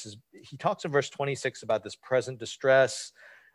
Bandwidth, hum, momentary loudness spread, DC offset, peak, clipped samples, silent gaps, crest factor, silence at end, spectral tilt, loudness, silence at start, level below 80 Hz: 12 kHz; none; 15 LU; under 0.1%; -10 dBFS; under 0.1%; none; 18 dB; 0.25 s; -4 dB/octave; -28 LUFS; 0 s; -72 dBFS